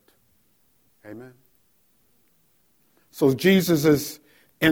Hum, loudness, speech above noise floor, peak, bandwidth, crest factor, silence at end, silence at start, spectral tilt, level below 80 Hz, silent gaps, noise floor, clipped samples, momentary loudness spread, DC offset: none; -21 LUFS; 44 dB; -4 dBFS; 18 kHz; 20 dB; 0 s; 1.05 s; -5.5 dB/octave; -58 dBFS; none; -65 dBFS; under 0.1%; 26 LU; under 0.1%